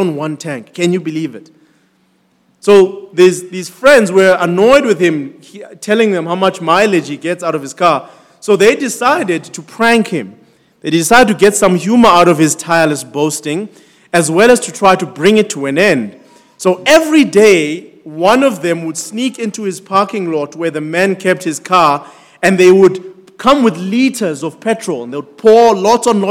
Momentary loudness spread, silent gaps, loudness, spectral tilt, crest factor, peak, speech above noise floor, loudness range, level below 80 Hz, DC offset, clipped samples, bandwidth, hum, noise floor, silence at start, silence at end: 13 LU; none; -11 LUFS; -4.5 dB/octave; 12 dB; 0 dBFS; 44 dB; 4 LU; -50 dBFS; under 0.1%; 2%; 18 kHz; none; -56 dBFS; 0 s; 0 s